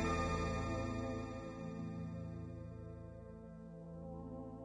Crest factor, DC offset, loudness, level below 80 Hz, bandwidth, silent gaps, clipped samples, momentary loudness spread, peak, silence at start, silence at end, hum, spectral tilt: 18 dB; under 0.1%; -44 LUFS; -52 dBFS; 10.5 kHz; none; under 0.1%; 14 LU; -26 dBFS; 0 s; 0 s; none; -6.5 dB/octave